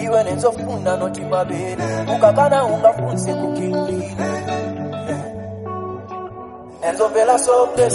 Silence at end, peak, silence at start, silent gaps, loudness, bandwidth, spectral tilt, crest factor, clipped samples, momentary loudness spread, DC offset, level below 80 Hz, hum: 0 s; -2 dBFS; 0 s; none; -19 LUFS; 11.5 kHz; -5.5 dB/octave; 18 dB; under 0.1%; 15 LU; under 0.1%; -52 dBFS; none